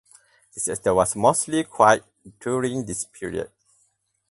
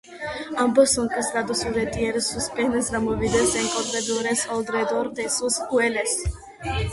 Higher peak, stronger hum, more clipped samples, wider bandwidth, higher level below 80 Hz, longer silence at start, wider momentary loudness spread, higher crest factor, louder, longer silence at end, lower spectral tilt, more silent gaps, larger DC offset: first, -2 dBFS vs -6 dBFS; neither; neither; about the same, 12 kHz vs 12 kHz; second, -54 dBFS vs -40 dBFS; first, 0.55 s vs 0.05 s; first, 14 LU vs 7 LU; about the same, 22 dB vs 18 dB; about the same, -22 LUFS vs -23 LUFS; first, 0.85 s vs 0 s; about the same, -4 dB/octave vs -3.5 dB/octave; neither; neither